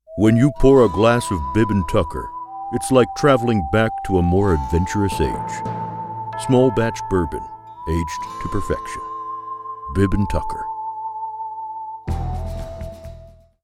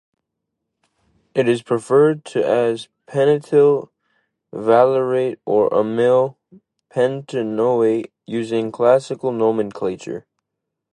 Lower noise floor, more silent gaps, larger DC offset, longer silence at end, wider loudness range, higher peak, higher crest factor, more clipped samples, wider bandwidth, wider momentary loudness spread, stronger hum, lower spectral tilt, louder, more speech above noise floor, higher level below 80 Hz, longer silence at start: second, -43 dBFS vs -80 dBFS; neither; neither; second, 0.35 s vs 0.75 s; first, 8 LU vs 3 LU; about the same, 0 dBFS vs 0 dBFS; about the same, 18 dB vs 18 dB; neither; first, 15.5 kHz vs 11 kHz; first, 16 LU vs 11 LU; neither; about the same, -6.5 dB/octave vs -7 dB/octave; about the same, -20 LUFS vs -18 LUFS; second, 26 dB vs 63 dB; first, -32 dBFS vs -66 dBFS; second, 0.1 s vs 1.35 s